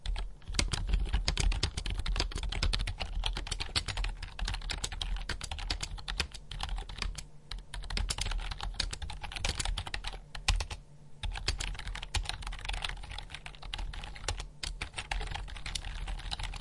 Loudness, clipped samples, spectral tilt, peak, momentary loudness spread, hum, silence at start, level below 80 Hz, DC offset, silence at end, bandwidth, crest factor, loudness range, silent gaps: -37 LUFS; under 0.1%; -2.5 dB/octave; -10 dBFS; 9 LU; none; 0 s; -38 dBFS; 0.1%; 0 s; 11.5 kHz; 26 dB; 5 LU; none